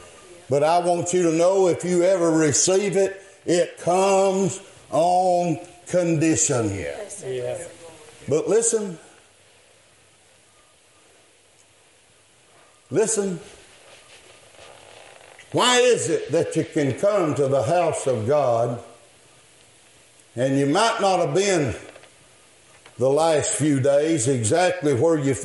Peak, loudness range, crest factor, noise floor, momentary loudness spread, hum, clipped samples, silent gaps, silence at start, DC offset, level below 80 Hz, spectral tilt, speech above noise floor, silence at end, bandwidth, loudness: -6 dBFS; 10 LU; 16 dB; -56 dBFS; 11 LU; none; under 0.1%; none; 0 s; under 0.1%; -64 dBFS; -4.5 dB/octave; 36 dB; 0 s; 11.5 kHz; -21 LUFS